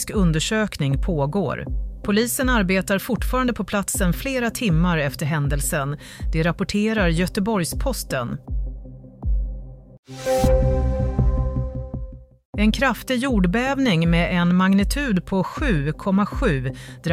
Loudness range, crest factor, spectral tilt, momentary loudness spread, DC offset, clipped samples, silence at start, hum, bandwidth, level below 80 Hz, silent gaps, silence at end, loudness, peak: 5 LU; 14 dB; -5.5 dB/octave; 12 LU; under 0.1%; under 0.1%; 0 s; none; 16 kHz; -28 dBFS; 9.98-10.03 s, 12.45-12.53 s; 0 s; -22 LUFS; -6 dBFS